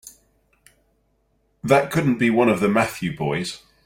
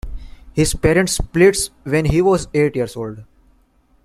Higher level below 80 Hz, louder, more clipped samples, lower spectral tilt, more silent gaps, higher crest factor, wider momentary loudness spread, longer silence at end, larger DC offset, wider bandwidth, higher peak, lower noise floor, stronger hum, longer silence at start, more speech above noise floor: second, -54 dBFS vs -32 dBFS; second, -20 LUFS vs -17 LUFS; neither; about the same, -6 dB/octave vs -5 dB/octave; neither; about the same, 22 dB vs 18 dB; second, 9 LU vs 13 LU; second, 0.3 s vs 0.8 s; neither; about the same, 16.5 kHz vs 15 kHz; about the same, -2 dBFS vs 0 dBFS; first, -66 dBFS vs -56 dBFS; neither; about the same, 0.05 s vs 0.05 s; first, 46 dB vs 40 dB